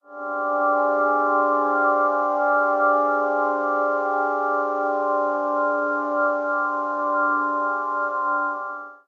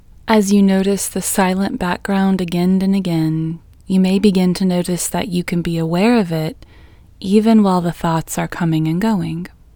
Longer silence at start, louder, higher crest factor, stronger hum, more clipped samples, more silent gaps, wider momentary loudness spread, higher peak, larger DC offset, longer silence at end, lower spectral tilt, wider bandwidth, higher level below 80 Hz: second, 0.1 s vs 0.25 s; second, -22 LUFS vs -16 LUFS; about the same, 14 dB vs 16 dB; neither; neither; neither; second, 5 LU vs 8 LU; second, -8 dBFS vs 0 dBFS; neither; second, 0.15 s vs 0.3 s; about the same, -5 dB/octave vs -6 dB/octave; second, 6.8 kHz vs 19.5 kHz; second, under -90 dBFS vs -42 dBFS